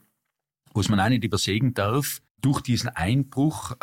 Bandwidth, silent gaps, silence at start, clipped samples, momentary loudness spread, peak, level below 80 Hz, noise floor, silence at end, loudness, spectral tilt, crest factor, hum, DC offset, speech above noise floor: 17 kHz; 2.31-2.35 s; 0.75 s; under 0.1%; 5 LU; -8 dBFS; -50 dBFS; -82 dBFS; 0.1 s; -24 LUFS; -5.5 dB/octave; 16 dB; none; under 0.1%; 59 dB